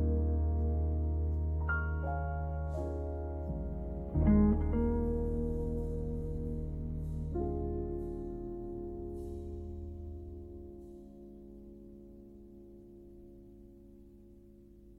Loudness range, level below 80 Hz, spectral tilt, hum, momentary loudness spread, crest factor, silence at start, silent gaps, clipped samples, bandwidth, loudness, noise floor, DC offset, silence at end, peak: 20 LU; -40 dBFS; -11 dB/octave; none; 22 LU; 20 dB; 0 s; none; under 0.1%; 2.2 kHz; -36 LUFS; -56 dBFS; under 0.1%; 0 s; -16 dBFS